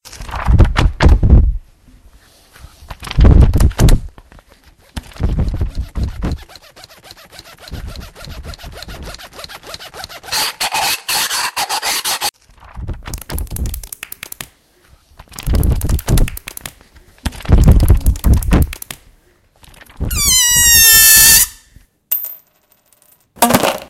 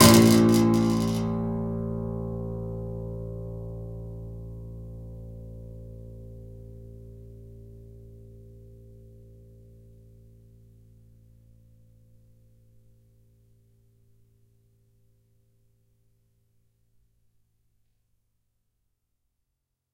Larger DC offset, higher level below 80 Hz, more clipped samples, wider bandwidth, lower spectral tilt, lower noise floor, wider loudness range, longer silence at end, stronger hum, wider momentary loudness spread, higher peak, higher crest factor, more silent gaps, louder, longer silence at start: neither; first, -18 dBFS vs -48 dBFS; first, 0.1% vs under 0.1%; about the same, 17.5 kHz vs 16 kHz; second, -3 dB/octave vs -5 dB/octave; second, -56 dBFS vs -81 dBFS; second, 19 LU vs 26 LU; second, 0.05 s vs 11.35 s; neither; second, 24 LU vs 28 LU; about the same, 0 dBFS vs -2 dBFS; second, 14 dB vs 28 dB; neither; first, -12 LUFS vs -25 LUFS; about the same, 0.05 s vs 0 s